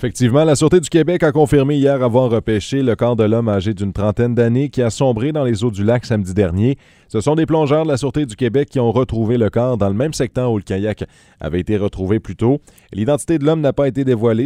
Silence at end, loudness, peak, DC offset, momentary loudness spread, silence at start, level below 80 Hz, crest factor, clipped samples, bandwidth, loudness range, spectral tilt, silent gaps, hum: 0 s; -16 LUFS; 0 dBFS; under 0.1%; 7 LU; 0 s; -40 dBFS; 16 dB; under 0.1%; 13.5 kHz; 4 LU; -7 dB/octave; none; none